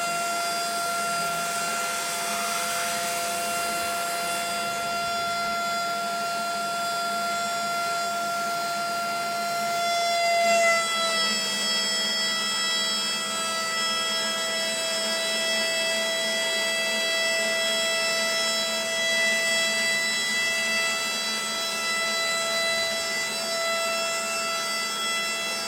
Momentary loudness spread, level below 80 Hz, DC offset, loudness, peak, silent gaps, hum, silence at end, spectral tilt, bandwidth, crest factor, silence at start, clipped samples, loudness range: 5 LU; -68 dBFS; under 0.1%; -24 LUFS; -10 dBFS; none; none; 0 s; 0 dB/octave; 16.5 kHz; 16 dB; 0 s; under 0.1%; 4 LU